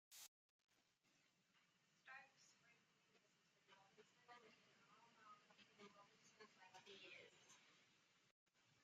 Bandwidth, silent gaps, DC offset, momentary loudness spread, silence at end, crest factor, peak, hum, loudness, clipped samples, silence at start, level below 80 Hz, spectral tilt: 7.6 kHz; 0.28-0.68 s, 8.31-8.46 s; under 0.1%; 7 LU; 0 s; 22 dB; -48 dBFS; none; -66 LUFS; under 0.1%; 0.1 s; under -90 dBFS; -0.5 dB/octave